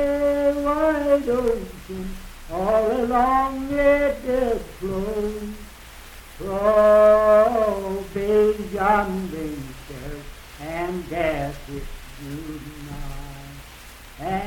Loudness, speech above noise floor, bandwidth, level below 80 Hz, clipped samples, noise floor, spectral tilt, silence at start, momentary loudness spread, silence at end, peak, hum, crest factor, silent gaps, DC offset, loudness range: -21 LUFS; 21 dB; 18 kHz; -38 dBFS; under 0.1%; -42 dBFS; -6 dB/octave; 0 s; 23 LU; 0 s; -6 dBFS; none; 16 dB; none; under 0.1%; 12 LU